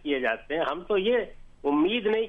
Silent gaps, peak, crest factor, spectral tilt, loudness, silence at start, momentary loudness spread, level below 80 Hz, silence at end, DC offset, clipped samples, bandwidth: none; -14 dBFS; 12 dB; -6.5 dB/octave; -27 LUFS; 0.05 s; 6 LU; -52 dBFS; 0 s; under 0.1%; under 0.1%; 5.2 kHz